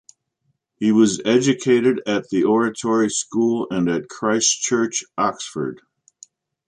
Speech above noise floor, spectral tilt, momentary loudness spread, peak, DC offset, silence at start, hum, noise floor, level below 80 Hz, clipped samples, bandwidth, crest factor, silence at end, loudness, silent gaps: 52 dB; -4 dB/octave; 7 LU; -4 dBFS; under 0.1%; 0.8 s; none; -71 dBFS; -62 dBFS; under 0.1%; 10 kHz; 16 dB; 0.9 s; -19 LUFS; none